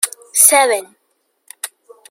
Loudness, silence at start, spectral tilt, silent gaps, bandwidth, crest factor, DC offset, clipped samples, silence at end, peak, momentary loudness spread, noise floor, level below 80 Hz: -11 LUFS; 0 s; 2 dB/octave; none; over 20 kHz; 18 dB; under 0.1%; under 0.1%; 0.45 s; 0 dBFS; 20 LU; -66 dBFS; -74 dBFS